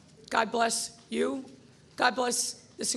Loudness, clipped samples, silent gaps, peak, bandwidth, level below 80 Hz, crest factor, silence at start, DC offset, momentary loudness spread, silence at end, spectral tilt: -29 LUFS; under 0.1%; none; -10 dBFS; 13 kHz; -70 dBFS; 22 dB; 0.3 s; under 0.1%; 8 LU; 0 s; -1.5 dB/octave